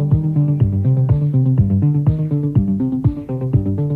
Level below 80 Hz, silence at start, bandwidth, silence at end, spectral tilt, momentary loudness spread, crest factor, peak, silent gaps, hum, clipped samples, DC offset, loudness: -32 dBFS; 0 s; 3 kHz; 0 s; -12.5 dB/octave; 4 LU; 12 dB; -2 dBFS; none; none; under 0.1%; under 0.1%; -17 LUFS